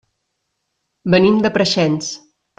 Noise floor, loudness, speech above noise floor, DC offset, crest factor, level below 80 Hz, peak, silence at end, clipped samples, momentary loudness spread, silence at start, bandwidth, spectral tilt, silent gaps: -73 dBFS; -15 LUFS; 58 dB; under 0.1%; 16 dB; -54 dBFS; -2 dBFS; 0.4 s; under 0.1%; 15 LU; 1.05 s; 9.4 kHz; -5 dB/octave; none